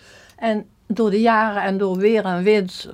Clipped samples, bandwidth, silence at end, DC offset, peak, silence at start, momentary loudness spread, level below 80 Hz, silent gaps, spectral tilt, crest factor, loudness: under 0.1%; 10.5 kHz; 0 s; under 0.1%; -4 dBFS; 0.4 s; 9 LU; -60 dBFS; none; -6.5 dB/octave; 14 dB; -19 LUFS